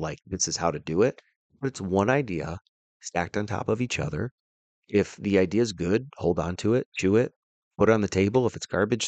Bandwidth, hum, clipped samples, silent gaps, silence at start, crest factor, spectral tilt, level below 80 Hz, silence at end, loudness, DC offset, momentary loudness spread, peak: 9.2 kHz; none; under 0.1%; 1.36-1.50 s, 2.69-3.00 s, 4.31-4.82 s, 6.86-6.92 s, 7.36-7.71 s; 0 s; 18 dB; -5 dB/octave; -56 dBFS; 0 s; -26 LUFS; under 0.1%; 10 LU; -8 dBFS